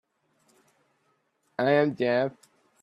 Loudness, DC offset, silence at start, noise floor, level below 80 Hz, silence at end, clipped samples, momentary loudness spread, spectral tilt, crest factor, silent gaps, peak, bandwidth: -25 LUFS; under 0.1%; 1.6 s; -72 dBFS; -74 dBFS; 0.5 s; under 0.1%; 10 LU; -7.5 dB/octave; 22 dB; none; -8 dBFS; 11 kHz